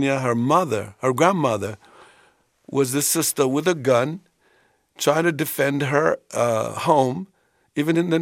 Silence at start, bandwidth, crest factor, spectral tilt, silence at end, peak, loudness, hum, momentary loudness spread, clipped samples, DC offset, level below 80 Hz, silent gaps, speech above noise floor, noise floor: 0 s; 16 kHz; 20 dB; -4.5 dB/octave; 0 s; -2 dBFS; -21 LUFS; none; 9 LU; under 0.1%; under 0.1%; -66 dBFS; none; 41 dB; -61 dBFS